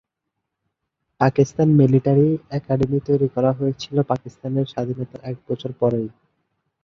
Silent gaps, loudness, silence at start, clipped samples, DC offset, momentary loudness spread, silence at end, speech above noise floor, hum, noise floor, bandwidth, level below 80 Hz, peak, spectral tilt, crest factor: none; -20 LUFS; 1.2 s; under 0.1%; under 0.1%; 13 LU; 0.75 s; 60 dB; none; -80 dBFS; 7 kHz; -54 dBFS; -2 dBFS; -8.5 dB/octave; 20 dB